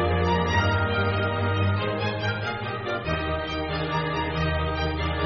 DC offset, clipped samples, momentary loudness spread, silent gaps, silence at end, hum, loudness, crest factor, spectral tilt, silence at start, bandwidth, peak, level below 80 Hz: under 0.1%; under 0.1%; 6 LU; none; 0 s; none; -26 LUFS; 14 dB; -4.5 dB/octave; 0 s; 6.2 kHz; -10 dBFS; -38 dBFS